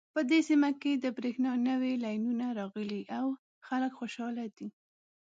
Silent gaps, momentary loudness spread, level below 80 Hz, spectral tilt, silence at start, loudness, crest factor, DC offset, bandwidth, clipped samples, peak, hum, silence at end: 3.39-3.61 s; 11 LU; -86 dBFS; -5.5 dB/octave; 0.15 s; -32 LUFS; 16 dB; under 0.1%; 7.8 kHz; under 0.1%; -16 dBFS; none; 0.5 s